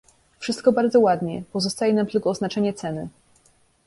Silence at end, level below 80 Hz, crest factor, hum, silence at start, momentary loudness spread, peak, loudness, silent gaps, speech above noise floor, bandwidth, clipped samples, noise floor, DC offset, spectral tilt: 0.75 s; -60 dBFS; 18 dB; none; 0.4 s; 13 LU; -4 dBFS; -22 LUFS; none; 39 dB; 11.5 kHz; under 0.1%; -60 dBFS; under 0.1%; -5.5 dB/octave